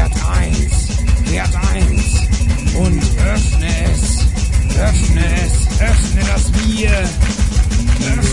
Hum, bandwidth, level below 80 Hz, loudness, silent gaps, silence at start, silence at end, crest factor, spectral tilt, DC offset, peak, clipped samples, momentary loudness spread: none; 11.5 kHz; -14 dBFS; -15 LUFS; none; 0 s; 0 s; 12 dB; -5 dB/octave; 1%; 0 dBFS; under 0.1%; 2 LU